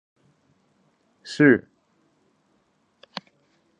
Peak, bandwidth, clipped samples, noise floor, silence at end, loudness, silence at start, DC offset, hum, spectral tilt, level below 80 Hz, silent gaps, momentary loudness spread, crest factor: -2 dBFS; 9.2 kHz; under 0.1%; -67 dBFS; 2.2 s; -19 LUFS; 1.25 s; under 0.1%; none; -6.5 dB/octave; -70 dBFS; none; 21 LU; 24 dB